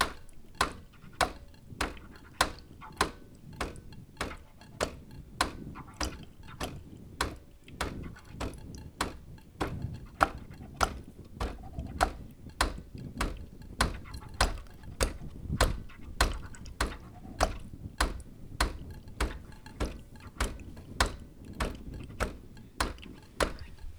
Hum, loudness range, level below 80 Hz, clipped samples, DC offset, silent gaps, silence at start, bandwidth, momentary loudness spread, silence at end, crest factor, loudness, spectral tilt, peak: none; 5 LU; -40 dBFS; under 0.1%; under 0.1%; none; 0 s; over 20 kHz; 18 LU; 0 s; 32 dB; -35 LUFS; -3.5 dB/octave; -4 dBFS